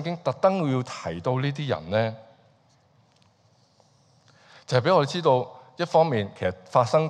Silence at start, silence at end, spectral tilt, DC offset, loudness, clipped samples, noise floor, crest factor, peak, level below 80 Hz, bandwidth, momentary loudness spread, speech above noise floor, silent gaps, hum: 0 s; 0 s; -6.5 dB/octave; under 0.1%; -25 LUFS; under 0.1%; -62 dBFS; 20 dB; -6 dBFS; -64 dBFS; 9.8 kHz; 9 LU; 38 dB; none; none